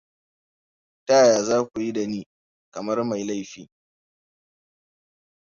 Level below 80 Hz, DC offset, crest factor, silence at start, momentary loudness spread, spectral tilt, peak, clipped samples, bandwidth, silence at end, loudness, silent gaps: -68 dBFS; under 0.1%; 20 dB; 1.1 s; 20 LU; -4 dB/octave; -6 dBFS; under 0.1%; 7.6 kHz; 1.8 s; -22 LUFS; 2.26-2.72 s